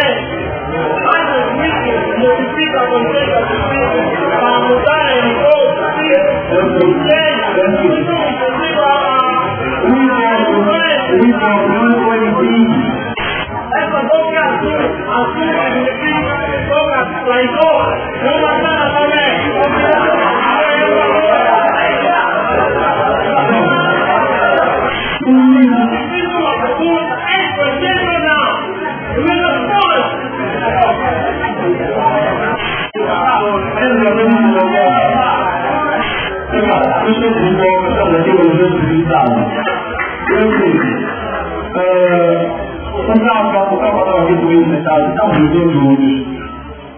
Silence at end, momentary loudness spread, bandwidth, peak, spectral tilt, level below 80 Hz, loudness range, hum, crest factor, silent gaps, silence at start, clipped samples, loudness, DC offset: 0 s; 6 LU; 3.5 kHz; 0 dBFS; -9.5 dB/octave; -36 dBFS; 3 LU; none; 12 dB; none; 0 s; under 0.1%; -12 LUFS; under 0.1%